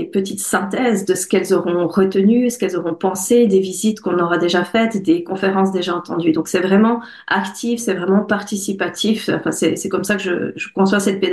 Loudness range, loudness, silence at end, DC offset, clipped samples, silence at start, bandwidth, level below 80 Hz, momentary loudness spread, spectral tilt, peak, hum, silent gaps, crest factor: 3 LU; -17 LUFS; 0 s; under 0.1%; under 0.1%; 0 s; 12.5 kHz; -60 dBFS; 7 LU; -5 dB/octave; -4 dBFS; none; none; 12 dB